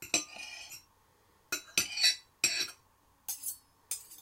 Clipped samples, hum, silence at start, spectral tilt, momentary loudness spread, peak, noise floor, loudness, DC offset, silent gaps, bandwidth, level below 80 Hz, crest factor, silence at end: under 0.1%; none; 0 s; 1 dB/octave; 18 LU; -10 dBFS; -67 dBFS; -32 LUFS; under 0.1%; none; 16.5 kHz; -72 dBFS; 26 dB; 0.05 s